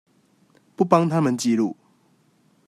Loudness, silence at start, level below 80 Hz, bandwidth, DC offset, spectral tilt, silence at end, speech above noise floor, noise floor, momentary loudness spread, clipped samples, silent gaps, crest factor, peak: -21 LUFS; 0.8 s; -68 dBFS; 14 kHz; under 0.1%; -6.5 dB/octave; 0.95 s; 42 dB; -61 dBFS; 9 LU; under 0.1%; none; 20 dB; -4 dBFS